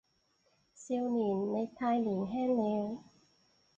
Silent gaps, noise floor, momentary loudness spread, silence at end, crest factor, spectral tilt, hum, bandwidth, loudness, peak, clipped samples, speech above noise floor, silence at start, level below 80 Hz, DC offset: none; -74 dBFS; 8 LU; 0.75 s; 14 dB; -7.5 dB/octave; none; 8.2 kHz; -34 LUFS; -20 dBFS; under 0.1%; 42 dB; 0.75 s; -72 dBFS; under 0.1%